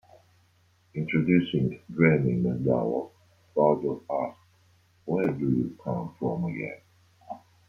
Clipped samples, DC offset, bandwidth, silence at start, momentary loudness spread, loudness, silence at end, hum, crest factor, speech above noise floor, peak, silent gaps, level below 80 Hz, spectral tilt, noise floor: under 0.1%; under 0.1%; 6.4 kHz; 0.95 s; 17 LU; -27 LUFS; 0.3 s; none; 22 dB; 38 dB; -6 dBFS; none; -62 dBFS; -9.5 dB/octave; -64 dBFS